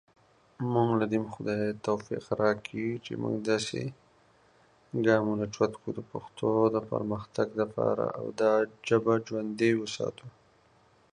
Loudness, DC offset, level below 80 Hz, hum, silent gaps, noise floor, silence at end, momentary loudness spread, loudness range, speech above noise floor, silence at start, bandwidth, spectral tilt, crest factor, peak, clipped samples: -30 LUFS; under 0.1%; -66 dBFS; none; none; -63 dBFS; 0.85 s; 10 LU; 3 LU; 34 dB; 0.6 s; 10.5 kHz; -6 dB/octave; 20 dB; -10 dBFS; under 0.1%